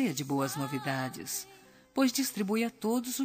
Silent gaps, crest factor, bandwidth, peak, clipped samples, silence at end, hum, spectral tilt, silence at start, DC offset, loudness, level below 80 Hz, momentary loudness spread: none; 16 dB; 15.5 kHz; -16 dBFS; under 0.1%; 0 s; none; -4 dB/octave; 0 s; under 0.1%; -32 LUFS; -74 dBFS; 8 LU